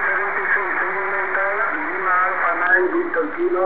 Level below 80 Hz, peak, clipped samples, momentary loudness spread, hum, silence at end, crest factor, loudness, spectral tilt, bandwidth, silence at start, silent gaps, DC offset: -58 dBFS; -4 dBFS; under 0.1%; 5 LU; 50 Hz at -60 dBFS; 0 s; 16 dB; -19 LUFS; -7.5 dB/octave; 4 kHz; 0 s; none; 2%